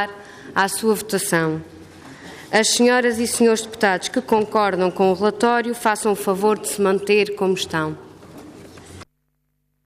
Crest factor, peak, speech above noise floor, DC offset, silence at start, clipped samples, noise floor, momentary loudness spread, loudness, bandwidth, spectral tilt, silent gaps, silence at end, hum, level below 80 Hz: 16 dB; -4 dBFS; 51 dB; under 0.1%; 0 s; under 0.1%; -70 dBFS; 10 LU; -19 LUFS; 15.5 kHz; -3.5 dB/octave; none; 0.85 s; none; -60 dBFS